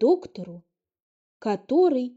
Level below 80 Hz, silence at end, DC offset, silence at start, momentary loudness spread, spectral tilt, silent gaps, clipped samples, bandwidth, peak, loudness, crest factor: -74 dBFS; 0.05 s; under 0.1%; 0 s; 18 LU; -6.5 dB/octave; 1.02-1.40 s; under 0.1%; 7.8 kHz; -10 dBFS; -24 LUFS; 16 dB